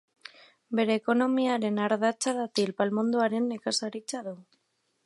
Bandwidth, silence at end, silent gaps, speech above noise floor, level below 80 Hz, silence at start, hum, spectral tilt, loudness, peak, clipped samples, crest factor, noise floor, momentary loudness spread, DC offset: 11.5 kHz; 0.65 s; none; 48 dB; -80 dBFS; 0.7 s; none; -4 dB/octave; -28 LUFS; -10 dBFS; under 0.1%; 18 dB; -75 dBFS; 12 LU; under 0.1%